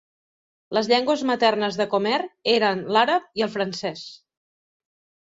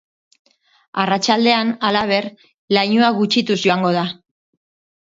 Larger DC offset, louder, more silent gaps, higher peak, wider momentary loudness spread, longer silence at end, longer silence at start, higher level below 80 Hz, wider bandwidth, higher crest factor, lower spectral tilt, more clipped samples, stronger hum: neither; second, -22 LUFS vs -17 LUFS; second, none vs 2.54-2.68 s; second, -4 dBFS vs 0 dBFS; about the same, 8 LU vs 10 LU; about the same, 1.05 s vs 1 s; second, 0.7 s vs 0.95 s; second, -68 dBFS vs -62 dBFS; about the same, 7.8 kHz vs 7.8 kHz; about the same, 20 dB vs 18 dB; about the same, -4.5 dB/octave vs -4.5 dB/octave; neither; neither